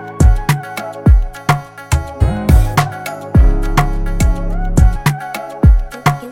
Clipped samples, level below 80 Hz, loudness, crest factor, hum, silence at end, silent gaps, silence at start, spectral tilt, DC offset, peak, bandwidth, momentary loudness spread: under 0.1%; -14 dBFS; -15 LUFS; 12 dB; none; 0 s; none; 0 s; -6.5 dB/octave; under 0.1%; 0 dBFS; 16.5 kHz; 7 LU